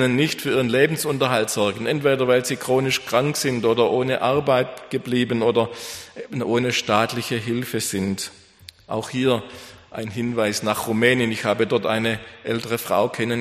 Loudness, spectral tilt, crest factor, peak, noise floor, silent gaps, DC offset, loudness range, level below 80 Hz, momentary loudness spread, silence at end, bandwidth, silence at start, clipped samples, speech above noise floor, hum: -21 LUFS; -4.5 dB/octave; 20 dB; -2 dBFS; -47 dBFS; none; under 0.1%; 5 LU; -58 dBFS; 10 LU; 0 s; 15.5 kHz; 0 s; under 0.1%; 26 dB; none